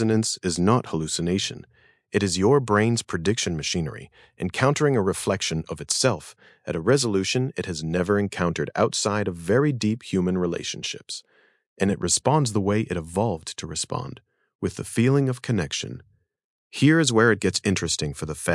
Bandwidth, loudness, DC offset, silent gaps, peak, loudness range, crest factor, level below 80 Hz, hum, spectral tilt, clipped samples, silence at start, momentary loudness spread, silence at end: 12 kHz; -24 LUFS; under 0.1%; 11.66-11.76 s, 14.55-14.59 s, 16.44-16.70 s; -6 dBFS; 3 LU; 18 dB; -56 dBFS; none; -4.5 dB/octave; under 0.1%; 0 s; 12 LU; 0 s